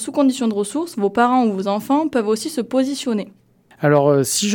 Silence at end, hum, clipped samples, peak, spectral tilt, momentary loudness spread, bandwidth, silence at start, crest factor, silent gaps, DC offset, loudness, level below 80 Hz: 0 s; none; under 0.1%; -2 dBFS; -5 dB/octave; 7 LU; 19 kHz; 0 s; 16 dB; none; under 0.1%; -19 LUFS; -64 dBFS